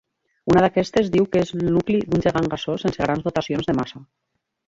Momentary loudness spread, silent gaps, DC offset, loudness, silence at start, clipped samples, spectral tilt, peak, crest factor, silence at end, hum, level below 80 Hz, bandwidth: 7 LU; none; under 0.1%; -21 LUFS; 0.45 s; under 0.1%; -7 dB/octave; -4 dBFS; 18 dB; 0.65 s; none; -46 dBFS; 7.8 kHz